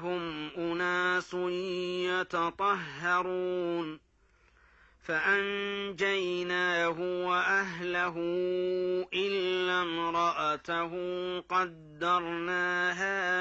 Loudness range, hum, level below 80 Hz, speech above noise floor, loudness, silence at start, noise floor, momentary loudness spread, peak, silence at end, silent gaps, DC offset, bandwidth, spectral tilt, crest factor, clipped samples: 3 LU; none; -68 dBFS; 34 dB; -31 LUFS; 0 s; -65 dBFS; 7 LU; -16 dBFS; 0 s; none; under 0.1%; 8 kHz; -4.5 dB/octave; 16 dB; under 0.1%